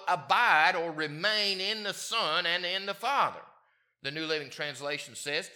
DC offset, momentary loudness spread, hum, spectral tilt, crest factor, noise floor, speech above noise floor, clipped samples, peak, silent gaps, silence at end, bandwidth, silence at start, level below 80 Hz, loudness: under 0.1%; 12 LU; none; -2 dB/octave; 22 dB; -67 dBFS; 37 dB; under 0.1%; -8 dBFS; none; 0 s; 19 kHz; 0 s; -86 dBFS; -29 LUFS